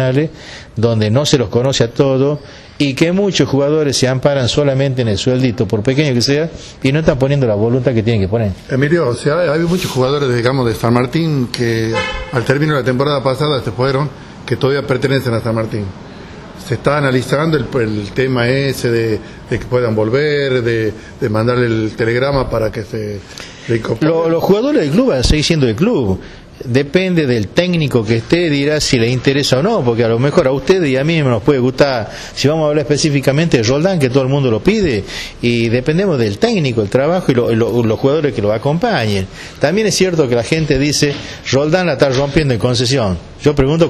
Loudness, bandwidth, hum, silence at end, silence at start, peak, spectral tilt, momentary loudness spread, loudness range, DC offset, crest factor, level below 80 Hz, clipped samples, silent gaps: -14 LUFS; 14 kHz; none; 0 s; 0 s; -2 dBFS; -5.5 dB/octave; 6 LU; 3 LU; under 0.1%; 12 dB; -34 dBFS; under 0.1%; none